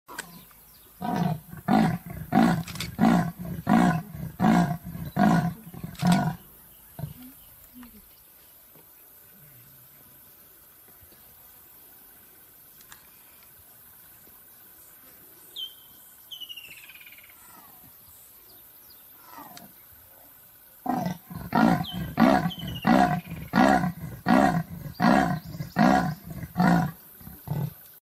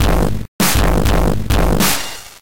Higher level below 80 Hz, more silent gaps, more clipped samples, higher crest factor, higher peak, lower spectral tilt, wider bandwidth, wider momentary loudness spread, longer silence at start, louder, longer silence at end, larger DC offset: second, -52 dBFS vs -20 dBFS; second, none vs 0.48-0.59 s; neither; first, 22 dB vs 12 dB; about the same, -6 dBFS vs -4 dBFS; first, -6.5 dB/octave vs -4.5 dB/octave; about the same, 16 kHz vs 17.5 kHz; first, 26 LU vs 7 LU; about the same, 0.1 s vs 0 s; second, -25 LUFS vs -16 LUFS; first, 0.3 s vs 0 s; second, under 0.1% vs 10%